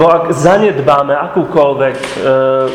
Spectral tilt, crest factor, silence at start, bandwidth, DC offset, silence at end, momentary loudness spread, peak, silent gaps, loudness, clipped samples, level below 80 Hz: -6 dB/octave; 10 dB; 0 s; 12.5 kHz; under 0.1%; 0 s; 5 LU; 0 dBFS; none; -11 LUFS; 0.4%; -46 dBFS